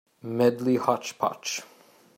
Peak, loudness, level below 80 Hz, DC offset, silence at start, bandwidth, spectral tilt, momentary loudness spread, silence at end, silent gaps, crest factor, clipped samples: -6 dBFS; -26 LUFS; -72 dBFS; under 0.1%; 0.25 s; 16 kHz; -4.5 dB/octave; 10 LU; 0.55 s; none; 20 dB; under 0.1%